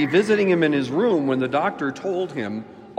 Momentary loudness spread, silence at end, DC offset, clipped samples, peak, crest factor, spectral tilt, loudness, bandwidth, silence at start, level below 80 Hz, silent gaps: 10 LU; 0 s; under 0.1%; under 0.1%; -6 dBFS; 16 dB; -6.5 dB/octave; -21 LUFS; 10 kHz; 0 s; -68 dBFS; none